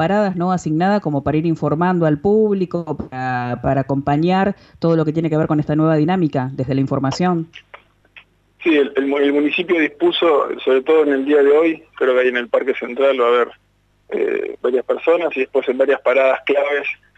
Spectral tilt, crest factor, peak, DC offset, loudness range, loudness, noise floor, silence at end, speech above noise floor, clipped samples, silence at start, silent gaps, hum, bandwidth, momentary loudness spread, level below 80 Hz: -7.5 dB/octave; 12 dB; -6 dBFS; under 0.1%; 4 LU; -17 LUFS; -48 dBFS; 0.2 s; 31 dB; under 0.1%; 0 s; none; 50 Hz at -50 dBFS; 8 kHz; 7 LU; -50 dBFS